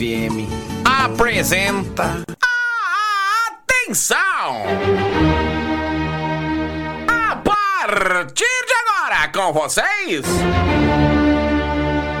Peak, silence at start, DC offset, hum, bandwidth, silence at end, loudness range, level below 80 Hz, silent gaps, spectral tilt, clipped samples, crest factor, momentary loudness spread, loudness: -4 dBFS; 0 s; under 0.1%; none; 19 kHz; 0 s; 2 LU; -32 dBFS; none; -4 dB/octave; under 0.1%; 14 dB; 6 LU; -17 LUFS